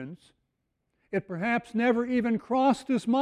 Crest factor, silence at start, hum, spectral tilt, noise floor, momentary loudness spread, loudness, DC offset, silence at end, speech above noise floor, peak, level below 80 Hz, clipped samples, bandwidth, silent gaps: 14 dB; 0 s; none; -6.5 dB/octave; -79 dBFS; 9 LU; -27 LUFS; under 0.1%; 0 s; 52 dB; -12 dBFS; -66 dBFS; under 0.1%; 10.5 kHz; none